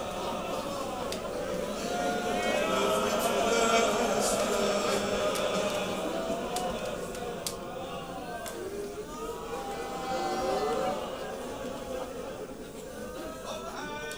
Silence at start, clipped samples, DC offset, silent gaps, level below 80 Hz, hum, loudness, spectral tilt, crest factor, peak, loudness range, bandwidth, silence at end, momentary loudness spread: 0 s; under 0.1%; 0.1%; none; -52 dBFS; none; -31 LUFS; -3.5 dB/octave; 22 dB; -10 dBFS; 9 LU; over 20 kHz; 0 s; 11 LU